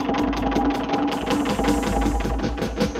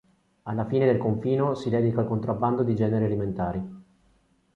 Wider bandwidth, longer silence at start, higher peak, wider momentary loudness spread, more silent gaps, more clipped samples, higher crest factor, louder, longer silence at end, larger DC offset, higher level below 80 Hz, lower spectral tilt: first, 15.5 kHz vs 7.4 kHz; second, 0 s vs 0.45 s; about the same, -8 dBFS vs -10 dBFS; second, 4 LU vs 10 LU; neither; neither; about the same, 16 dB vs 16 dB; first, -23 LUFS vs -26 LUFS; second, 0 s vs 0.75 s; neither; first, -30 dBFS vs -52 dBFS; second, -5.5 dB/octave vs -9.5 dB/octave